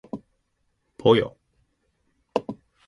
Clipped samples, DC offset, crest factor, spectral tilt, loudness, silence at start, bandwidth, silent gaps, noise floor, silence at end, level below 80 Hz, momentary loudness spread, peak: under 0.1%; under 0.1%; 24 dB; -7 dB/octave; -24 LUFS; 0.15 s; 10.5 kHz; none; -72 dBFS; 0.35 s; -60 dBFS; 20 LU; -4 dBFS